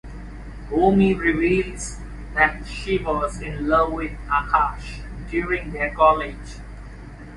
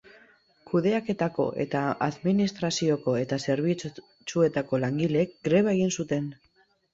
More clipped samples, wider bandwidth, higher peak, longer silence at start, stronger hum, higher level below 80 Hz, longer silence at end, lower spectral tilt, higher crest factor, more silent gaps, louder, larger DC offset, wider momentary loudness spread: neither; first, 11.5 kHz vs 7.8 kHz; first, -2 dBFS vs -10 dBFS; second, 0.05 s vs 0.65 s; neither; first, -34 dBFS vs -64 dBFS; second, 0 s vs 0.6 s; about the same, -6 dB/octave vs -6 dB/octave; about the same, 20 dB vs 18 dB; neither; first, -21 LUFS vs -27 LUFS; neither; first, 21 LU vs 6 LU